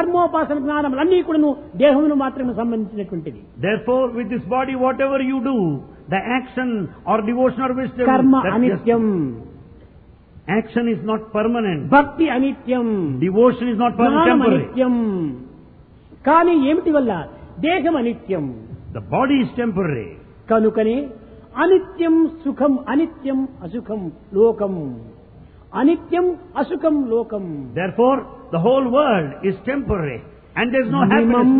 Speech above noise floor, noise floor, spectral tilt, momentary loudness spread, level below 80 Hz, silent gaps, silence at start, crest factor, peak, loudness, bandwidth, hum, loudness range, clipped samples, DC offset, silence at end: 28 dB; -46 dBFS; -11 dB/octave; 12 LU; -46 dBFS; none; 0 s; 18 dB; 0 dBFS; -19 LUFS; 4.2 kHz; none; 4 LU; under 0.1%; under 0.1%; 0 s